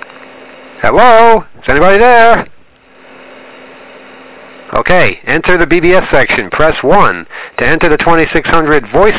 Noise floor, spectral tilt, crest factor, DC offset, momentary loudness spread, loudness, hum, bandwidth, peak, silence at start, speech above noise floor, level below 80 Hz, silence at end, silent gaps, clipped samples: -40 dBFS; -9 dB/octave; 10 dB; under 0.1%; 9 LU; -8 LUFS; none; 4 kHz; 0 dBFS; 0 s; 32 dB; -30 dBFS; 0 s; none; under 0.1%